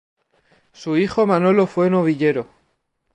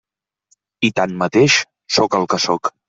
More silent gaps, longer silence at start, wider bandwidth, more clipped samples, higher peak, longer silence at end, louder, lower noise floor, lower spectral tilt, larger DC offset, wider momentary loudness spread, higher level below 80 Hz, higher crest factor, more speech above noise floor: neither; about the same, 0.8 s vs 0.8 s; first, 9.6 kHz vs 8.2 kHz; neither; about the same, -4 dBFS vs -2 dBFS; first, 0.7 s vs 0.2 s; about the same, -18 LUFS vs -16 LUFS; first, -69 dBFS vs -63 dBFS; first, -8 dB/octave vs -3.5 dB/octave; neither; first, 12 LU vs 6 LU; about the same, -58 dBFS vs -58 dBFS; about the same, 16 dB vs 16 dB; first, 52 dB vs 47 dB